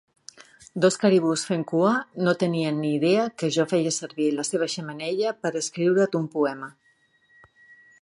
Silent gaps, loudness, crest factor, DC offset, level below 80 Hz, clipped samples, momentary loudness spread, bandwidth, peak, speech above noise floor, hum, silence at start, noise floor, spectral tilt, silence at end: none; -24 LUFS; 18 dB; under 0.1%; -72 dBFS; under 0.1%; 7 LU; 11.5 kHz; -6 dBFS; 40 dB; none; 0.75 s; -63 dBFS; -5 dB/octave; 1.3 s